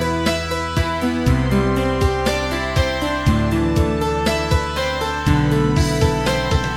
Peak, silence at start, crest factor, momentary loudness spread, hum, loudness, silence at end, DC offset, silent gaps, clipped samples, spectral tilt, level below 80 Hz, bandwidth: -2 dBFS; 0 s; 16 dB; 4 LU; none; -19 LUFS; 0 s; 0.4%; none; under 0.1%; -5.5 dB/octave; -26 dBFS; 18 kHz